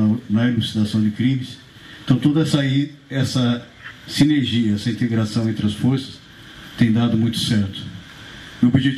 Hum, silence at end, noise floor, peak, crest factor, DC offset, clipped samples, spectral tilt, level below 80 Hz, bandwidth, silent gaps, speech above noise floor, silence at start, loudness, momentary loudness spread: none; 0 s; -40 dBFS; -6 dBFS; 14 dB; under 0.1%; under 0.1%; -6.5 dB/octave; -50 dBFS; 14.5 kHz; none; 22 dB; 0 s; -20 LUFS; 20 LU